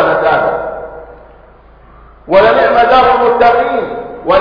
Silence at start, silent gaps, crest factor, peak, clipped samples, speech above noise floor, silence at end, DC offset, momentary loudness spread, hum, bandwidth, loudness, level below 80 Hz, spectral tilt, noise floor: 0 s; none; 12 dB; 0 dBFS; under 0.1%; 31 dB; 0 s; under 0.1%; 14 LU; none; 5.2 kHz; -10 LUFS; -38 dBFS; -6.5 dB/octave; -40 dBFS